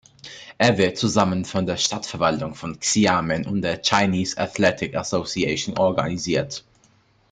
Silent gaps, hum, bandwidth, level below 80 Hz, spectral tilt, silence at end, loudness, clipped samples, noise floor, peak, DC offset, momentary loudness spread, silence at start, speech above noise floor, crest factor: none; none; 9.6 kHz; -54 dBFS; -4 dB/octave; 0.7 s; -22 LUFS; under 0.1%; -59 dBFS; 0 dBFS; under 0.1%; 9 LU; 0.25 s; 37 dB; 22 dB